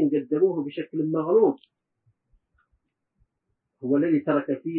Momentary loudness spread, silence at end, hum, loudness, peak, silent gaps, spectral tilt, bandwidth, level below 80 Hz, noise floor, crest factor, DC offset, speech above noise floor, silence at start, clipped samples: 10 LU; 0 s; none; -24 LUFS; -10 dBFS; none; -12 dB/octave; 4 kHz; -74 dBFS; -79 dBFS; 16 dB; under 0.1%; 55 dB; 0 s; under 0.1%